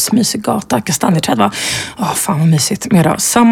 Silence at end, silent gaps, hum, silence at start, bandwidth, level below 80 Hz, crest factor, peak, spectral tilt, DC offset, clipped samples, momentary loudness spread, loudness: 0 s; none; none; 0 s; 17 kHz; -46 dBFS; 12 dB; 0 dBFS; -4.5 dB/octave; under 0.1%; under 0.1%; 6 LU; -13 LUFS